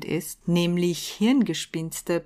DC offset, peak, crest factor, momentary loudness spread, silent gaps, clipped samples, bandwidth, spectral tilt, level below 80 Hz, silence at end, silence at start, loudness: under 0.1%; -12 dBFS; 14 dB; 8 LU; none; under 0.1%; 15.5 kHz; -5 dB/octave; -58 dBFS; 0 s; 0 s; -25 LUFS